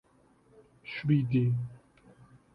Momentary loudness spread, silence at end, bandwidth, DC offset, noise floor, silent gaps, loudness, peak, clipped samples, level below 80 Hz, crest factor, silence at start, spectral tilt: 16 LU; 0.75 s; 5.4 kHz; under 0.1%; -64 dBFS; none; -30 LUFS; -14 dBFS; under 0.1%; -64 dBFS; 18 dB; 0.85 s; -9.5 dB/octave